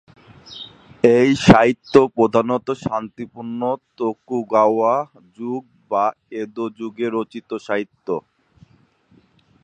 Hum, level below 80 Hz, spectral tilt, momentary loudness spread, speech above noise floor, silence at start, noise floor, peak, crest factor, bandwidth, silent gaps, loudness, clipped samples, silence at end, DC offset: none; -46 dBFS; -6.5 dB/octave; 18 LU; 38 dB; 0.45 s; -57 dBFS; 0 dBFS; 20 dB; 9.8 kHz; none; -19 LUFS; under 0.1%; 1.45 s; under 0.1%